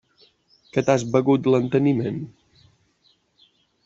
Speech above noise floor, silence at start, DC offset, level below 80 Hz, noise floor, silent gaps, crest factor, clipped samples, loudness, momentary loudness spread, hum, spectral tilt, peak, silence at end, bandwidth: 44 dB; 0.75 s; under 0.1%; -62 dBFS; -64 dBFS; none; 20 dB; under 0.1%; -21 LUFS; 11 LU; none; -7 dB/octave; -2 dBFS; 1.55 s; 7.8 kHz